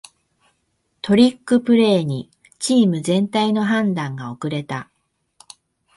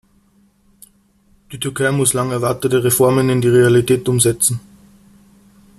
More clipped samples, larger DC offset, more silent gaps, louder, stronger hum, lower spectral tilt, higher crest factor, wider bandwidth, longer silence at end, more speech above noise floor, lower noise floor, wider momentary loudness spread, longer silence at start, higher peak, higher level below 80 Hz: neither; neither; neither; second, -19 LUFS vs -15 LUFS; neither; about the same, -5.5 dB/octave vs -5 dB/octave; about the same, 18 dB vs 18 dB; second, 11.5 kHz vs 14.5 kHz; about the same, 1.15 s vs 1.2 s; first, 51 dB vs 41 dB; first, -69 dBFS vs -55 dBFS; about the same, 13 LU vs 11 LU; second, 1.05 s vs 1.5 s; about the same, -2 dBFS vs 0 dBFS; second, -60 dBFS vs -50 dBFS